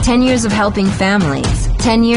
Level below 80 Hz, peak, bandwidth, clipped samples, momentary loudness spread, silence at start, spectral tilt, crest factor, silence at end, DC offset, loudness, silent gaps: -22 dBFS; -2 dBFS; 11.5 kHz; under 0.1%; 4 LU; 0 s; -5 dB/octave; 10 dB; 0 s; under 0.1%; -14 LUFS; none